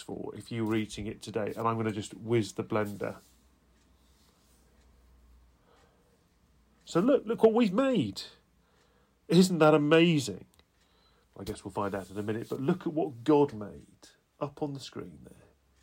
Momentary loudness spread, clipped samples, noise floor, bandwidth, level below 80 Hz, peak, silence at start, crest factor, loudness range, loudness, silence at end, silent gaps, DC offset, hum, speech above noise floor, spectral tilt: 18 LU; under 0.1%; -67 dBFS; 16 kHz; -64 dBFS; -12 dBFS; 0 s; 20 dB; 10 LU; -29 LUFS; 0.55 s; none; under 0.1%; none; 38 dB; -6 dB/octave